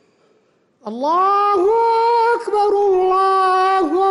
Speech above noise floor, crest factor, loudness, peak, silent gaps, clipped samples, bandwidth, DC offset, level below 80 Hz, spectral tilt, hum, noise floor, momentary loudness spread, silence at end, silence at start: 44 dB; 8 dB; -15 LUFS; -8 dBFS; none; under 0.1%; 11 kHz; under 0.1%; -58 dBFS; -4.5 dB/octave; none; -59 dBFS; 4 LU; 0 s; 0.85 s